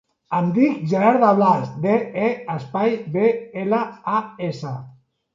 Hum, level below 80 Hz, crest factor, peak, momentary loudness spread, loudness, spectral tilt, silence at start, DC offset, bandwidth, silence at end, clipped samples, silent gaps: none; -66 dBFS; 18 dB; -2 dBFS; 13 LU; -20 LUFS; -8.5 dB/octave; 0.3 s; under 0.1%; 7.6 kHz; 0.45 s; under 0.1%; none